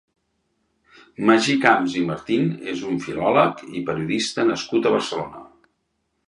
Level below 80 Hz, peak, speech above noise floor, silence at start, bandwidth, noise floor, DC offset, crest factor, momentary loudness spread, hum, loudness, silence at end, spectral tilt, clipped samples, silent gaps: -60 dBFS; 0 dBFS; 52 dB; 1.2 s; 11.5 kHz; -73 dBFS; under 0.1%; 22 dB; 11 LU; none; -21 LUFS; 0.85 s; -5 dB/octave; under 0.1%; none